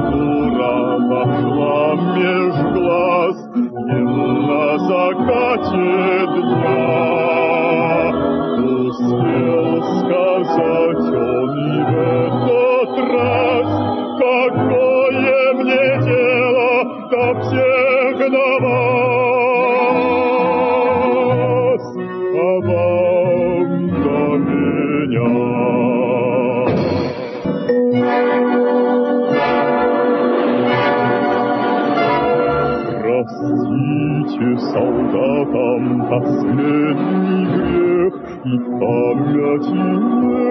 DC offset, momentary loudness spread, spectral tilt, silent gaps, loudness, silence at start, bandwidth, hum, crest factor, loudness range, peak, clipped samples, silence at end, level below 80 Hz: under 0.1%; 4 LU; -9 dB/octave; none; -16 LUFS; 0 s; 6 kHz; none; 14 dB; 2 LU; -2 dBFS; under 0.1%; 0 s; -48 dBFS